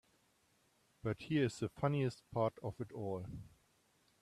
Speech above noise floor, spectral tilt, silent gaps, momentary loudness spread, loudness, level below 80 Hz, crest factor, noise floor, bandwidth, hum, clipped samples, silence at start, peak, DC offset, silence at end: 36 dB; -7 dB/octave; none; 10 LU; -40 LUFS; -68 dBFS; 20 dB; -75 dBFS; 13 kHz; none; under 0.1%; 1.05 s; -20 dBFS; under 0.1%; 0.75 s